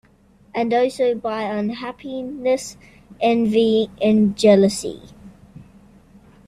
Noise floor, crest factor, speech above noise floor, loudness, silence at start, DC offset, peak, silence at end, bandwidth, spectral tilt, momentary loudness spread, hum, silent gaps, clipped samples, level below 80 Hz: -53 dBFS; 18 dB; 34 dB; -19 LUFS; 0.55 s; under 0.1%; -2 dBFS; 0.85 s; 13.5 kHz; -5.5 dB/octave; 16 LU; none; none; under 0.1%; -54 dBFS